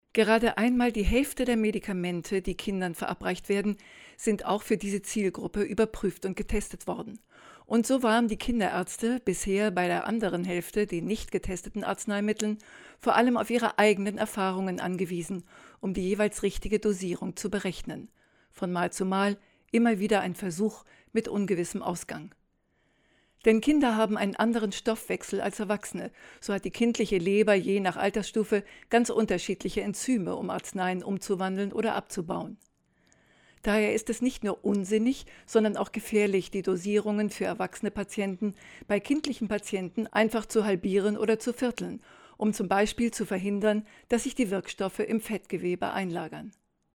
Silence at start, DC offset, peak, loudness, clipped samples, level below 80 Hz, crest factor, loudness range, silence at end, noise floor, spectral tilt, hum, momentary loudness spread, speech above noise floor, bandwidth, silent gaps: 0.15 s; under 0.1%; -6 dBFS; -29 LUFS; under 0.1%; -48 dBFS; 22 dB; 4 LU; 0.45 s; -71 dBFS; -5 dB/octave; none; 10 LU; 43 dB; 18 kHz; none